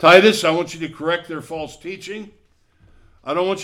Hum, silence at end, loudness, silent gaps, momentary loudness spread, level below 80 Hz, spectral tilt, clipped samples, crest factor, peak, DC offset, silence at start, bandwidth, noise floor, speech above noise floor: none; 0 s; -19 LUFS; none; 20 LU; -56 dBFS; -4 dB/octave; under 0.1%; 18 dB; 0 dBFS; under 0.1%; 0 s; 16 kHz; -56 dBFS; 38 dB